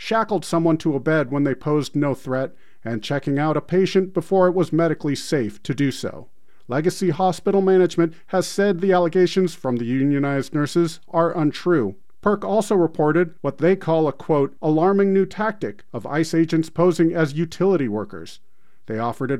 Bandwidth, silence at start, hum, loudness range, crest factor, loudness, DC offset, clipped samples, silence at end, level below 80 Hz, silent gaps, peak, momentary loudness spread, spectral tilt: 15 kHz; 0 s; none; 3 LU; 16 dB; -21 LUFS; 1%; under 0.1%; 0 s; -58 dBFS; none; -4 dBFS; 8 LU; -6.5 dB/octave